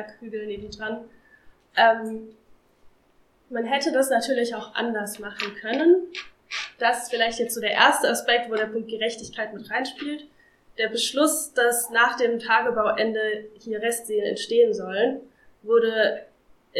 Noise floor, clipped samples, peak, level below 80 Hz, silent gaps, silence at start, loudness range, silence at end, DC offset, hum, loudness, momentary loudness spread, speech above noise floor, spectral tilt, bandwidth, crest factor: -61 dBFS; under 0.1%; -2 dBFS; -64 dBFS; none; 0 s; 4 LU; 0 s; under 0.1%; none; -23 LUFS; 14 LU; 38 dB; -2 dB/octave; 16 kHz; 22 dB